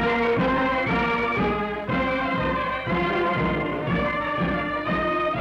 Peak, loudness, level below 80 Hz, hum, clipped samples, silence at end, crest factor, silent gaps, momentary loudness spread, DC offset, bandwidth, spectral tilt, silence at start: -14 dBFS; -24 LUFS; -42 dBFS; none; under 0.1%; 0 s; 8 dB; none; 4 LU; under 0.1%; 8 kHz; -7.5 dB/octave; 0 s